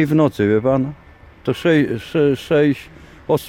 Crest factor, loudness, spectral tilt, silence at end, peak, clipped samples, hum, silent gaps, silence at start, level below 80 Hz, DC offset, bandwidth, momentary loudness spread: 14 dB; -18 LUFS; -7.5 dB/octave; 0 s; -4 dBFS; under 0.1%; none; none; 0 s; -48 dBFS; under 0.1%; 16.5 kHz; 11 LU